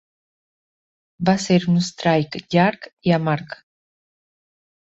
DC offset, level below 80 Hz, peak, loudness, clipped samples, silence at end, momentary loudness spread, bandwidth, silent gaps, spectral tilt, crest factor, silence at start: under 0.1%; -58 dBFS; -4 dBFS; -20 LUFS; under 0.1%; 1.4 s; 8 LU; 8 kHz; 2.93-2.97 s; -6 dB/octave; 20 dB; 1.2 s